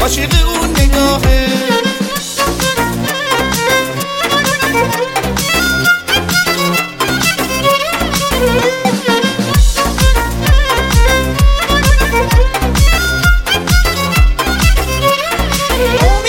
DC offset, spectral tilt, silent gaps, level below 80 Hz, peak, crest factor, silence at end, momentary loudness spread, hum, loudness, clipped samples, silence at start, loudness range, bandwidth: under 0.1%; -4 dB/octave; none; -16 dBFS; 0 dBFS; 12 dB; 0 s; 3 LU; none; -12 LUFS; under 0.1%; 0 s; 2 LU; 17 kHz